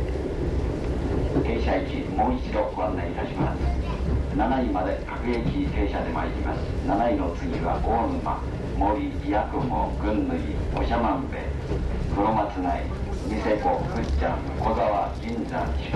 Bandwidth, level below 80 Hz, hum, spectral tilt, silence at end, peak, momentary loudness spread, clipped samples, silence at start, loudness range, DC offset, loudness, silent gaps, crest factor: 9.6 kHz; -30 dBFS; none; -8 dB/octave; 0 s; -10 dBFS; 5 LU; under 0.1%; 0 s; 1 LU; under 0.1%; -26 LUFS; none; 14 dB